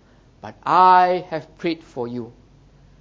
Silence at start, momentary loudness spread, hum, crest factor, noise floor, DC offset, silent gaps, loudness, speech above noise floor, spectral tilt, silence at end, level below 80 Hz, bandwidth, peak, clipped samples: 0.45 s; 20 LU; none; 18 dB; -50 dBFS; under 0.1%; none; -18 LUFS; 32 dB; -6.5 dB/octave; 0.7 s; -56 dBFS; 7.6 kHz; -2 dBFS; under 0.1%